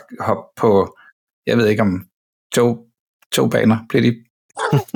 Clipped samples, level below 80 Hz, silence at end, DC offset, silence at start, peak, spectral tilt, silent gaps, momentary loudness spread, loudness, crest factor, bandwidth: under 0.1%; -56 dBFS; 0.1 s; under 0.1%; 0.1 s; -4 dBFS; -6 dB/octave; 1.12-1.27 s, 1.33-1.42 s, 2.12-2.50 s, 2.99-3.20 s, 3.26-3.30 s, 4.30-4.49 s; 13 LU; -18 LUFS; 14 dB; 19 kHz